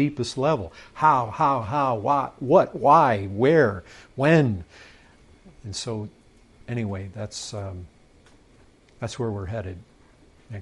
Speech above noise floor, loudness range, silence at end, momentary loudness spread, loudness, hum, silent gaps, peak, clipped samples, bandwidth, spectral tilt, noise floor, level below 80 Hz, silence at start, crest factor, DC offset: 32 dB; 14 LU; 0 s; 19 LU; -23 LUFS; none; none; -4 dBFS; under 0.1%; 11.5 kHz; -6.5 dB/octave; -55 dBFS; -56 dBFS; 0 s; 20 dB; under 0.1%